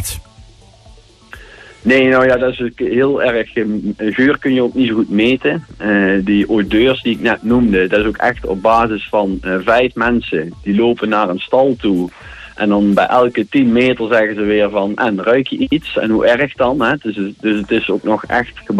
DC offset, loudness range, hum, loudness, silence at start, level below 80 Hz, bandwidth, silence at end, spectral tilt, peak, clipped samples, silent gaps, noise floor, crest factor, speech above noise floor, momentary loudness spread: under 0.1%; 2 LU; none; -14 LUFS; 0 s; -40 dBFS; 13.5 kHz; 0 s; -6 dB/octave; -2 dBFS; under 0.1%; none; -43 dBFS; 12 dB; 29 dB; 6 LU